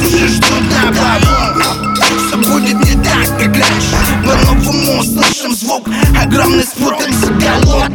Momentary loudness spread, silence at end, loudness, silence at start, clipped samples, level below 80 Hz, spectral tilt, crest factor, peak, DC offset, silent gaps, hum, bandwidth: 3 LU; 0 s; -10 LUFS; 0 s; under 0.1%; -18 dBFS; -4 dB/octave; 10 dB; 0 dBFS; under 0.1%; none; none; over 20 kHz